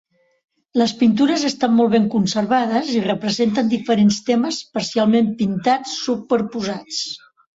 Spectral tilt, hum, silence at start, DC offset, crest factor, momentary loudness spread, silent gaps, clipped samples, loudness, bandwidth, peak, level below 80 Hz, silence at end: -5 dB/octave; none; 0.75 s; under 0.1%; 14 dB; 8 LU; none; under 0.1%; -19 LUFS; 8 kHz; -4 dBFS; -60 dBFS; 0.4 s